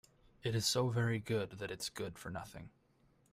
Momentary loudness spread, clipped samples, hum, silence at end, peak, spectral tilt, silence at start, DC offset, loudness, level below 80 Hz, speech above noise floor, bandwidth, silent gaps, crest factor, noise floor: 13 LU; under 0.1%; none; 0.65 s; -18 dBFS; -4.5 dB/octave; 0.45 s; under 0.1%; -38 LUFS; -66 dBFS; 34 dB; 16 kHz; none; 20 dB; -71 dBFS